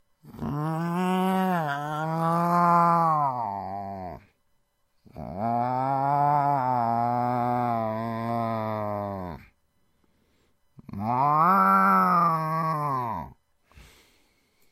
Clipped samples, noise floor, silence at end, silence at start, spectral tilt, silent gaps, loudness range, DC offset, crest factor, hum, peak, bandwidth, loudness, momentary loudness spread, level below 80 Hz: under 0.1%; -69 dBFS; 1.4 s; 0.25 s; -7.5 dB/octave; none; 7 LU; under 0.1%; 18 dB; none; -8 dBFS; 15.5 kHz; -25 LUFS; 16 LU; -60 dBFS